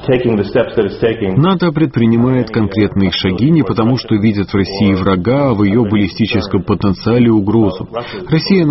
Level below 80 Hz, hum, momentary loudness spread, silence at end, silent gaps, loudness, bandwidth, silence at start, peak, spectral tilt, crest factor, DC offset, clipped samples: -38 dBFS; none; 4 LU; 0 s; none; -13 LUFS; 6 kHz; 0 s; 0 dBFS; -6.5 dB/octave; 12 dB; under 0.1%; under 0.1%